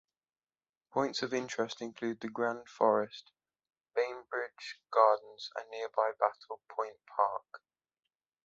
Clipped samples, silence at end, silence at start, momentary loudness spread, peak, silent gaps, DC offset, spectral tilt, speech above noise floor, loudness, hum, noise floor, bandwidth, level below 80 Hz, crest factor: under 0.1%; 0.9 s; 0.95 s; 14 LU; -10 dBFS; none; under 0.1%; -4 dB/octave; over 57 dB; -34 LUFS; none; under -90 dBFS; 7.8 kHz; -84 dBFS; 24 dB